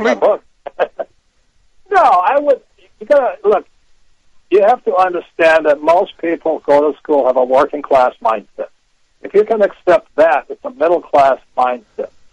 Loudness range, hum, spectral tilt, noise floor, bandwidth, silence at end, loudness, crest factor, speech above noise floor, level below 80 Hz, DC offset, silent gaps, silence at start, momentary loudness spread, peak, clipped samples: 2 LU; none; -5 dB/octave; -55 dBFS; 9.8 kHz; 0.25 s; -14 LUFS; 12 dB; 42 dB; -54 dBFS; under 0.1%; none; 0 s; 12 LU; -2 dBFS; under 0.1%